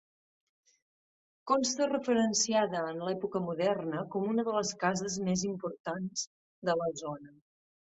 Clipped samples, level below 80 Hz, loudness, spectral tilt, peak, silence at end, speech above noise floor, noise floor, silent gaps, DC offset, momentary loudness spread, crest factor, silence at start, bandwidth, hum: under 0.1%; -72 dBFS; -32 LUFS; -4 dB/octave; -14 dBFS; 0.65 s; over 58 dB; under -90 dBFS; 5.80-5.84 s, 6.27-6.62 s; under 0.1%; 10 LU; 20 dB; 1.45 s; 8.4 kHz; none